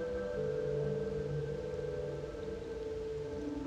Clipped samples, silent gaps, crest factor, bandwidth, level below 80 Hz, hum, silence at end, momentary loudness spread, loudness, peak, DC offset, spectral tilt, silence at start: under 0.1%; none; 12 dB; 9.4 kHz; -52 dBFS; none; 0 s; 6 LU; -39 LUFS; -26 dBFS; under 0.1%; -7.5 dB/octave; 0 s